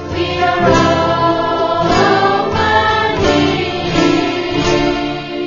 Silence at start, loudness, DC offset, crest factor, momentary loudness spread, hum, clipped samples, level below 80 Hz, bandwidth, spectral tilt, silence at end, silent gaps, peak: 0 s; -13 LUFS; under 0.1%; 14 dB; 5 LU; none; under 0.1%; -32 dBFS; 7.4 kHz; -5 dB/octave; 0 s; none; 0 dBFS